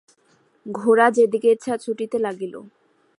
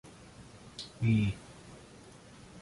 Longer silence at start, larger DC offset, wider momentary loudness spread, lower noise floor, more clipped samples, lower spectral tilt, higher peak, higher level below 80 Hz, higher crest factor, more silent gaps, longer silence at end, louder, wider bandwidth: first, 0.65 s vs 0.05 s; neither; second, 18 LU vs 24 LU; first, -61 dBFS vs -54 dBFS; neither; second, -5 dB/octave vs -6.5 dB/octave; first, -2 dBFS vs -18 dBFS; second, -74 dBFS vs -54 dBFS; about the same, 20 dB vs 18 dB; neither; first, 0.5 s vs 0 s; first, -20 LUFS vs -33 LUFS; about the same, 11.5 kHz vs 11.5 kHz